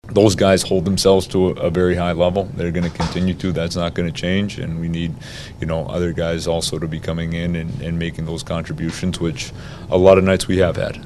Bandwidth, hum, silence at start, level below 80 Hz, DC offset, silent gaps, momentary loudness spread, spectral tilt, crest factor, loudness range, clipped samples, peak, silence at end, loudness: 13.5 kHz; none; 0.05 s; -36 dBFS; under 0.1%; none; 11 LU; -5.5 dB/octave; 18 dB; 5 LU; under 0.1%; 0 dBFS; 0 s; -19 LUFS